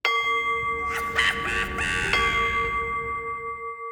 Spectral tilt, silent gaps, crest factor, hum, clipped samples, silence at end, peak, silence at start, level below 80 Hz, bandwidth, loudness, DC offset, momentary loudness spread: -2.5 dB/octave; none; 20 dB; none; under 0.1%; 0 s; -6 dBFS; 0.05 s; -42 dBFS; over 20 kHz; -24 LUFS; under 0.1%; 9 LU